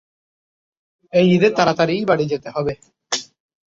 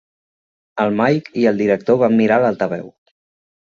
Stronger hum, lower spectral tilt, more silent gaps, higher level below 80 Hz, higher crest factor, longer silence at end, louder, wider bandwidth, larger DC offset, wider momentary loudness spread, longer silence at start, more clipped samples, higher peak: neither; second, -5.5 dB/octave vs -8 dB/octave; neither; about the same, -56 dBFS vs -60 dBFS; about the same, 18 dB vs 16 dB; second, 0.55 s vs 0.75 s; about the same, -18 LUFS vs -16 LUFS; about the same, 7.8 kHz vs 7.2 kHz; neither; about the same, 10 LU vs 9 LU; first, 1.15 s vs 0.75 s; neither; about the same, -2 dBFS vs -2 dBFS